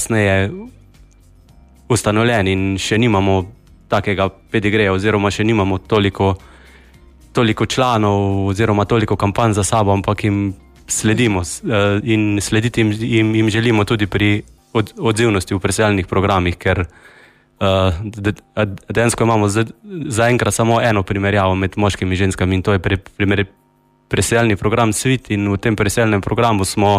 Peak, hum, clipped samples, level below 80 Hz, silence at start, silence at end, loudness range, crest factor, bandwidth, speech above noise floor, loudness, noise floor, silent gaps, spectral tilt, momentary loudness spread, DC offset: -2 dBFS; none; under 0.1%; -40 dBFS; 0 s; 0 s; 2 LU; 14 dB; 15.5 kHz; 31 dB; -16 LUFS; -47 dBFS; none; -5.5 dB/octave; 7 LU; under 0.1%